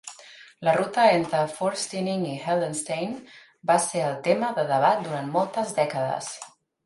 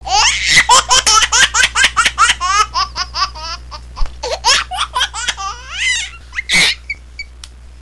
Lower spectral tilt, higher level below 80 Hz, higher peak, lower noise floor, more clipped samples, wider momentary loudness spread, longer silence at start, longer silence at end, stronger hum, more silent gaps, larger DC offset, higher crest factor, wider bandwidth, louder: first, -4.5 dB/octave vs 0.5 dB/octave; second, -72 dBFS vs -30 dBFS; second, -6 dBFS vs 0 dBFS; first, -48 dBFS vs -35 dBFS; neither; second, 13 LU vs 18 LU; about the same, 0.05 s vs 0.05 s; first, 0.35 s vs 0 s; neither; neither; second, under 0.1% vs 0.7%; first, 20 dB vs 14 dB; second, 11.5 kHz vs 15 kHz; second, -25 LUFS vs -12 LUFS